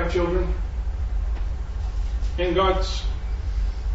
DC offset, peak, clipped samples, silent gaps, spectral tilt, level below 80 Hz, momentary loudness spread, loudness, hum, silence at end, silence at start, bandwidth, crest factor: under 0.1%; -8 dBFS; under 0.1%; none; -6.5 dB/octave; -26 dBFS; 9 LU; -26 LUFS; none; 0 s; 0 s; 7.8 kHz; 16 dB